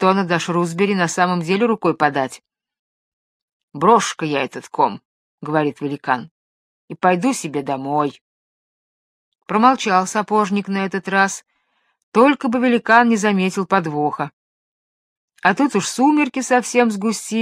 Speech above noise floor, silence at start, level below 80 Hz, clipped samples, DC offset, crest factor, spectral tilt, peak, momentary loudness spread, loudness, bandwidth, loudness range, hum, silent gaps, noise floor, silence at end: 49 dB; 0 s; -70 dBFS; under 0.1%; under 0.1%; 18 dB; -5 dB/octave; 0 dBFS; 9 LU; -18 LUFS; 14.5 kHz; 5 LU; none; 2.79-3.68 s, 5.05-5.38 s, 6.31-6.88 s, 8.21-9.32 s, 12.03-12.12 s, 14.33-15.28 s; -67 dBFS; 0 s